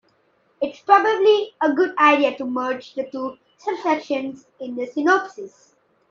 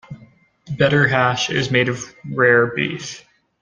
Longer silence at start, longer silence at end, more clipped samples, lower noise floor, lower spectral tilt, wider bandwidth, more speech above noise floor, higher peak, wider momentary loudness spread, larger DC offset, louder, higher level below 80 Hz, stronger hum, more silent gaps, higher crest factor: first, 0.6 s vs 0.1 s; first, 0.6 s vs 0.4 s; neither; first, -63 dBFS vs -50 dBFS; second, -3.5 dB/octave vs -5 dB/octave; second, 7.2 kHz vs 9.6 kHz; first, 43 dB vs 32 dB; about the same, -2 dBFS vs 0 dBFS; about the same, 17 LU vs 16 LU; neither; second, -20 LUFS vs -17 LUFS; second, -72 dBFS vs -54 dBFS; neither; neither; about the same, 20 dB vs 18 dB